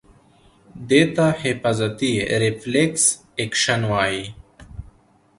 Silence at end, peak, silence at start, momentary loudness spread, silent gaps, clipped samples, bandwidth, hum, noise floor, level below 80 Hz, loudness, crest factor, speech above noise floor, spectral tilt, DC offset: 0.5 s; -2 dBFS; 0.75 s; 23 LU; none; under 0.1%; 11.5 kHz; none; -54 dBFS; -48 dBFS; -20 LUFS; 20 dB; 34 dB; -4 dB/octave; under 0.1%